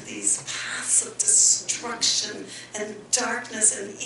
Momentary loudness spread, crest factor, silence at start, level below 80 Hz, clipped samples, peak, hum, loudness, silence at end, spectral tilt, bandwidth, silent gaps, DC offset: 17 LU; 18 dB; 0 s; -68 dBFS; under 0.1%; -6 dBFS; none; -21 LUFS; 0 s; 0.5 dB/octave; 11.5 kHz; none; under 0.1%